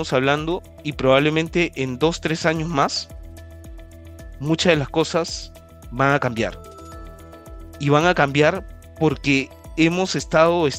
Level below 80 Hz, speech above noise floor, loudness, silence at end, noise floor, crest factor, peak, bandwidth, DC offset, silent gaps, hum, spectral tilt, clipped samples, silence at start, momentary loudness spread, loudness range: -42 dBFS; 20 dB; -20 LUFS; 0 s; -39 dBFS; 22 dB; 0 dBFS; 15.5 kHz; under 0.1%; none; none; -5 dB/octave; under 0.1%; 0 s; 23 LU; 4 LU